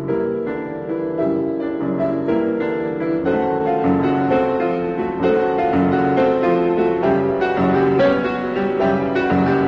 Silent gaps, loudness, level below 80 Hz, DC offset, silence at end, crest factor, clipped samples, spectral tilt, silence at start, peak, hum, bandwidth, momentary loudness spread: none; -19 LUFS; -46 dBFS; under 0.1%; 0 s; 12 dB; under 0.1%; -9 dB/octave; 0 s; -4 dBFS; none; 6.6 kHz; 6 LU